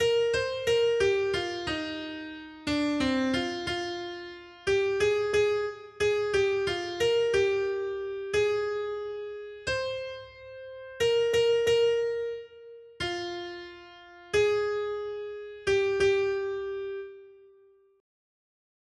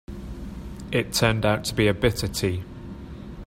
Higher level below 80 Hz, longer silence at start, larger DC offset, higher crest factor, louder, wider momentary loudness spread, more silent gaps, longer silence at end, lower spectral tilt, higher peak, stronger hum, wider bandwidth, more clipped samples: second, -58 dBFS vs -40 dBFS; about the same, 0 s vs 0.1 s; neither; second, 14 dB vs 20 dB; second, -28 LUFS vs -24 LUFS; about the same, 16 LU vs 18 LU; neither; first, 1.65 s vs 0.05 s; about the same, -4 dB/octave vs -5 dB/octave; second, -14 dBFS vs -4 dBFS; neither; second, 12.5 kHz vs 16 kHz; neither